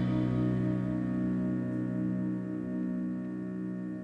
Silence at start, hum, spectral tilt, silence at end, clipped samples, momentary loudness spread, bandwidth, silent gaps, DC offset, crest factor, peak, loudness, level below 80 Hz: 0 s; none; -10 dB/octave; 0 s; under 0.1%; 7 LU; 5 kHz; none; under 0.1%; 12 dB; -20 dBFS; -33 LUFS; -54 dBFS